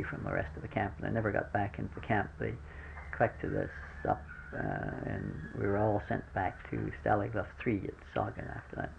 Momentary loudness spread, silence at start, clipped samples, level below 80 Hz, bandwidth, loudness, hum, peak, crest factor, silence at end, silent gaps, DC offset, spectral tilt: 9 LU; 0 s; under 0.1%; -50 dBFS; 8.4 kHz; -36 LUFS; none; -14 dBFS; 22 dB; 0 s; none; under 0.1%; -9 dB/octave